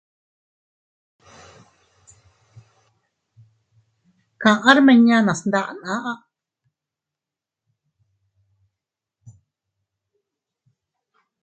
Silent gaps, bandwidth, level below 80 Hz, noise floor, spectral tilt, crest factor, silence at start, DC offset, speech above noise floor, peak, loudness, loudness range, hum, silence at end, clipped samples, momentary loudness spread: none; 8.8 kHz; -68 dBFS; -87 dBFS; -5 dB/octave; 24 dB; 4.4 s; under 0.1%; 71 dB; 0 dBFS; -17 LUFS; 14 LU; none; 5.25 s; under 0.1%; 15 LU